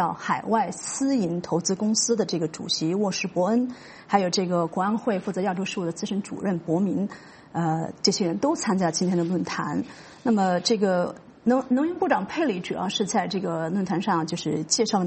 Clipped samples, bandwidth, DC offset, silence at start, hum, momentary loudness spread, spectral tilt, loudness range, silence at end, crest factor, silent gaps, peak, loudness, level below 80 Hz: under 0.1%; 8.8 kHz; under 0.1%; 0 s; none; 6 LU; -4.5 dB/octave; 2 LU; 0 s; 20 dB; none; -6 dBFS; -25 LUFS; -64 dBFS